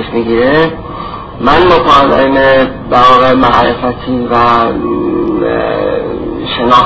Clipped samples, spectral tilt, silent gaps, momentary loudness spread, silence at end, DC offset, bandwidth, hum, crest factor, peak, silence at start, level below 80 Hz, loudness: 0.9%; -6.5 dB/octave; none; 10 LU; 0 s; under 0.1%; 8 kHz; none; 10 dB; 0 dBFS; 0 s; -30 dBFS; -9 LUFS